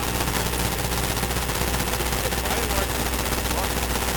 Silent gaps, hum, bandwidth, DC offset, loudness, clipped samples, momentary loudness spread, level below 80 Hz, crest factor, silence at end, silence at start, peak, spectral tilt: none; none; 19.5 kHz; under 0.1%; -24 LUFS; under 0.1%; 1 LU; -30 dBFS; 16 dB; 0 s; 0 s; -8 dBFS; -3 dB/octave